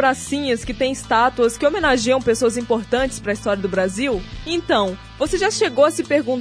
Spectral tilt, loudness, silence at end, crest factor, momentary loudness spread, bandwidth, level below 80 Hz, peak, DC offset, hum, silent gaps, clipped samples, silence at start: -4 dB/octave; -19 LUFS; 0 s; 16 dB; 7 LU; 11 kHz; -40 dBFS; -4 dBFS; under 0.1%; none; none; under 0.1%; 0 s